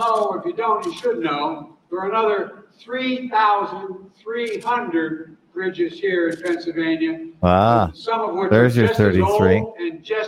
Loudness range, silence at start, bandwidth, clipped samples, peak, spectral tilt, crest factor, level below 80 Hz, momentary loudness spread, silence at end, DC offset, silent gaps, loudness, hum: 6 LU; 0 s; 16 kHz; under 0.1%; 0 dBFS; -7 dB/octave; 20 dB; -48 dBFS; 13 LU; 0 s; under 0.1%; none; -20 LUFS; none